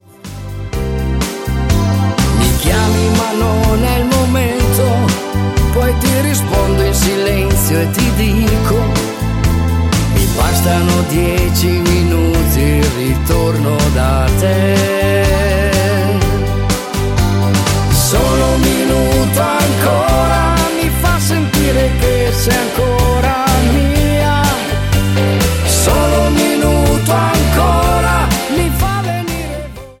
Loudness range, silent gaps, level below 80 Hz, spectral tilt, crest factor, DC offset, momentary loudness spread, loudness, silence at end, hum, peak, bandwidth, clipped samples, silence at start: 1 LU; none; -18 dBFS; -5 dB/octave; 12 dB; under 0.1%; 4 LU; -13 LUFS; 0.1 s; none; 0 dBFS; 17 kHz; under 0.1%; 0.25 s